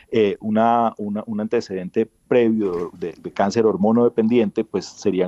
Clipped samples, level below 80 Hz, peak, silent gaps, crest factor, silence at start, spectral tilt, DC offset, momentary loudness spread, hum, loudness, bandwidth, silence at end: under 0.1%; -60 dBFS; -6 dBFS; none; 14 dB; 0.1 s; -7 dB/octave; under 0.1%; 10 LU; none; -20 LUFS; 8 kHz; 0 s